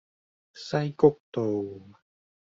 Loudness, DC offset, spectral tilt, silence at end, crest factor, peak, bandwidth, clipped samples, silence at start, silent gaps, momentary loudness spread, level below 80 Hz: -26 LUFS; under 0.1%; -6.5 dB/octave; 0.7 s; 22 dB; -6 dBFS; 7.6 kHz; under 0.1%; 0.55 s; 1.20-1.32 s; 19 LU; -68 dBFS